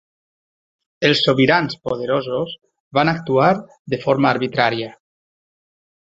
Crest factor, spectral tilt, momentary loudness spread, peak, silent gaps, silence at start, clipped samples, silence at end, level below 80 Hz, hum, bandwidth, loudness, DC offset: 18 dB; -6 dB/octave; 12 LU; -2 dBFS; 2.80-2.91 s, 3.79-3.85 s; 1 s; under 0.1%; 1.2 s; -58 dBFS; none; 7.8 kHz; -18 LUFS; under 0.1%